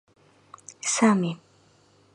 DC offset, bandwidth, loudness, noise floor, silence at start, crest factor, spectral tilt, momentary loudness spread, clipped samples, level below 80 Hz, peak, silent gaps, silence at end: under 0.1%; 11 kHz; -24 LUFS; -60 dBFS; 0.85 s; 20 dB; -4 dB/octave; 25 LU; under 0.1%; -74 dBFS; -8 dBFS; none; 0.8 s